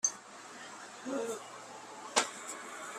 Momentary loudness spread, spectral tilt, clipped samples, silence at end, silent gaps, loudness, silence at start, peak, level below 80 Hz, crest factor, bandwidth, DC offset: 15 LU; 0 dB/octave; under 0.1%; 0 s; none; -38 LUFS; 0.05 s; -12 dBFS; -84 dBFS; 28 dB; 15 kHz; under 0.1%